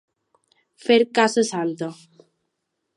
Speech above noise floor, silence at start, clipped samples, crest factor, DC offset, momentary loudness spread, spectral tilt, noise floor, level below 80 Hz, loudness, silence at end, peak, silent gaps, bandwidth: 57 dB; 0.85 s; under 0.1%; 20 dB; under 0.1%; 14 LU; -4 dB/octave; -78 dBFS; -78 dBFS; -21 LUFS; 1.05 s; -4 dBFS; none; 11.5 kHz